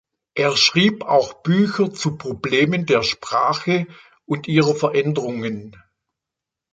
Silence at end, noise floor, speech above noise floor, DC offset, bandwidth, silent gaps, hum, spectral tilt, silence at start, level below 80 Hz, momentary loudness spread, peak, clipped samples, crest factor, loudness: 1 s; -85 dBFS; 66 dB; under 0.1%; 9.2 kHz; none; none; -5 dB/octave; 0.35 s; -58 dBFS; 12 LU; -2 dBFS; under 0.1%; 18 dB; -19 LUFS